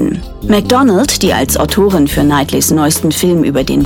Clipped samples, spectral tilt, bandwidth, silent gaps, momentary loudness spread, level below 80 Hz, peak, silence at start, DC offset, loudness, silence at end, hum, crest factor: under 0.1%; -4.5 dB/octave; 17.5 kHz; none; 3 LU; -28 dBFS; 0 dBFS; 0 s; under 0.1%; -11 LUFS; 0 s; none; 10 dB